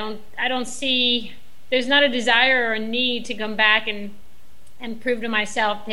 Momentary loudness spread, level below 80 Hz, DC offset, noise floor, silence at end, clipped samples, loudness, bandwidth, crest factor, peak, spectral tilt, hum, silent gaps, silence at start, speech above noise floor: 15 LU; -56 dBFS; 3%; -54 dBFS; 0 s; under 0.1%; -20 LUFS; 16 kHz; 18 dB; -4 dBFS; -2.5 dB/octave; none; none; 0 s; 32 dB